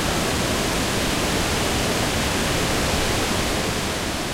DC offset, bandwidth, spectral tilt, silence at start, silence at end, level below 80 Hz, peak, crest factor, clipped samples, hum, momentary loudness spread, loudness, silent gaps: under 0.1%; 16 kHz; -3.5 dB/octave; 0 s; 0 s; -32 dBFS; -8 dBFS; 14 dB; under 0.1%; none; 2 LU; -21 LUFS; none